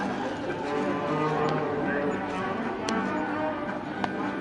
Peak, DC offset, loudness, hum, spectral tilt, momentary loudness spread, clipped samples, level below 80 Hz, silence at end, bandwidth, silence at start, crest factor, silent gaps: -8 dBFS; under 0.1%; -29 LUFS; none; -6 dB/octave; 5 LU; under 0.1%; -58 dBFS; 0 s; 11 kHz; 0 s; 20 dB; none